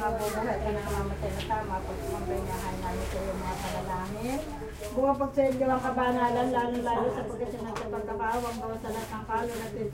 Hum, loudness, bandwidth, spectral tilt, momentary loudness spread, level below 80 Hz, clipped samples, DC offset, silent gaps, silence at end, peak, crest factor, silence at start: none; -31 LUFS; 16 kHz; -5.5 dB/octave; 8 LU; -42 dBFS; under 0.1%; under 0.1%; none; 0 s; -14 dBFS; 16 dB; 0 s